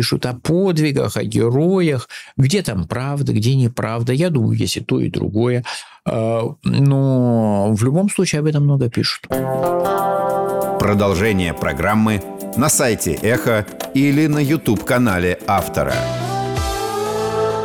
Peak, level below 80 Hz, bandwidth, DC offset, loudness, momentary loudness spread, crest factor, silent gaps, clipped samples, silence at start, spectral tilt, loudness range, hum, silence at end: -6 dBFS; -40 dBFS; 19 kHz; under 0.1%; -18 LUFS; 6 LU; 12 dB; none; under 0.1%; 0 s; -5.5 dB/octave; 2 LU; none; 0 s